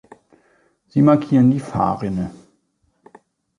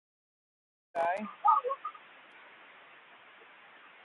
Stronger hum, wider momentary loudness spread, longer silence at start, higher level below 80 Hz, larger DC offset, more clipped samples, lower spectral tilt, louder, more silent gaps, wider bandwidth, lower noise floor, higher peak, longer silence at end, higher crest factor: neither; second, 11 LU vs 27 LU; about the same, 0.95 s vs 0.95 s; first, -50 dBFS vs under -90 dBFS; neither; neither; first, -9.5 dB/octave vs -5.5 dB/octave; first, -18 LUFS vs -31 LUFS; neither; about the same, 10.5 kHz vs 11 kHz; first, -66 dBFS vs -56 dBFS; first, -2 dBFS vs -14 dBFS; second, 1.25 s vs 2.05 s; second, 18 dB vs 24 dB